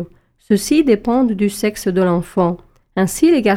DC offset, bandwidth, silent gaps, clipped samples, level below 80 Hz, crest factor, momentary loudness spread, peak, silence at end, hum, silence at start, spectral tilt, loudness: under 0.1%; 17 kHz; none; under 0.1%; -44 dBFS; 14 dB; 6 LU; -2 dBFS; 0 s; none; 0 s; -6 dB/octave; -16 LUFS